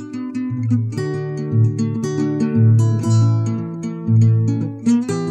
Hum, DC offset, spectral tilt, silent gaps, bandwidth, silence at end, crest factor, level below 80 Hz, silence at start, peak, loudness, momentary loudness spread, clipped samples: none; under 0.1%; -8.5 dB/octave; none; 9 kHz; 0 s; 12 dB; -56 dBFS; 0 s; -6 dBFS; -18 LUFS; 10 LU; under 0.1%